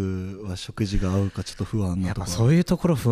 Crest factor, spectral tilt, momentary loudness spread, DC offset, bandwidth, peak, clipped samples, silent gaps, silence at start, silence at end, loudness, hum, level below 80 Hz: 14 dB; -6.5 dB/octave; 12 LU; under 0.1%; 15.5 kHz; -10 dBFS; under 0.1%; none; 0 s; 0 s; -25 LUFS; none; -36 dBFS